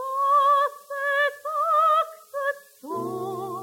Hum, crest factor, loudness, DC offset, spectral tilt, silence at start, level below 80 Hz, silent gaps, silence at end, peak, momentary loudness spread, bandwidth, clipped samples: none; 12 dB; -23 LUFS; under 0.1%; -4 dB/octave; 0 s; -82 dBFS; none; 0 s; -12 dBFS; 12 LU; 17 kHz; under 0.1%